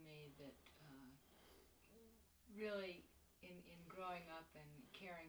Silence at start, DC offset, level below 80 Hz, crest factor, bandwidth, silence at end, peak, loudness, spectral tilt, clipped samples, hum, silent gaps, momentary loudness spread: 0 s; under 0.1%; -78 dBFS; 20 dB; over 20 kHz; 0 s; -38 dBFS; -56 LUFS; -5 dB/octave; under 0.1%; none; none; 19 LU